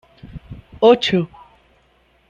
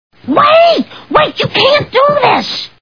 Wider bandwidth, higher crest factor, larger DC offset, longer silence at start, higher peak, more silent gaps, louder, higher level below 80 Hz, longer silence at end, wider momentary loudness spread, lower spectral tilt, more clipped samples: first, 7.6 kHz vs 5.4 kHz; first, 18 dB vs 10 dB; second, under 0.1% vs 0.3%; about the same, 0.25 s vs 0.25 s; about the same, -2 dBFS vs 0 dBFS; neither; second, -16 LUFS vs -10 LUFS; about the same, -48 dBFS vs -46 dBFS; first, 1.05 s vs 0.15 s; first, 26 LU vs 8 LU; about the same, -6 dB/octave vs -5 dB/octave; second, under 0.1% vs 0.3%